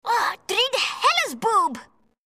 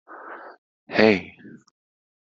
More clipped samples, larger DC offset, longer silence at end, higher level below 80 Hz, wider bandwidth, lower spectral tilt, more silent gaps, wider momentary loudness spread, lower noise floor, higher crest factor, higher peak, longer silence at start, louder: neither; neither; second, 0.45 s vs 1 s; second, -70 dBFS vs -64 dBFS; first, 15.5 kHz vs 7.4 kHz; second, -0.5 dB/octave vs -3.5 dB/octave; second, none vs 0.58-0.87 s; second, 5 LU vs 23 LU; about the same, -44 dBFS vs -41 dBFS; second, 18 dB vs 24 dB; second, -6 dBFS vs -2 dBFS; about the same, 0.05 s vs 0.1 s; about the same, -21 LUFS vs -20 LUFS